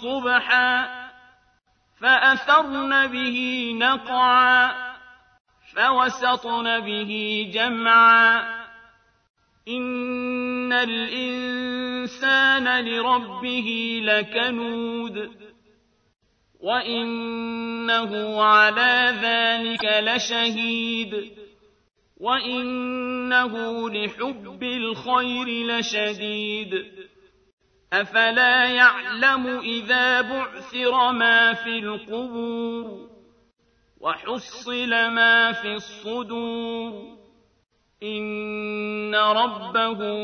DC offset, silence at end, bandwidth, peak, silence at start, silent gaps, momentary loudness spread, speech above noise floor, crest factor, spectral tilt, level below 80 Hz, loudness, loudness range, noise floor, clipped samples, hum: under 0.1%; 0 s; 6.6 kHz; -4 dBFS; 0 s; 5.40-5.45 s, 9.30-9.34 s, 27.53-27.58 s; 14 LU; 42 dB; 20 dB; -3 dB/octave; -66 dBFS; -21 LUFS; 7 LU; -64 dBFS; under 0.1%; none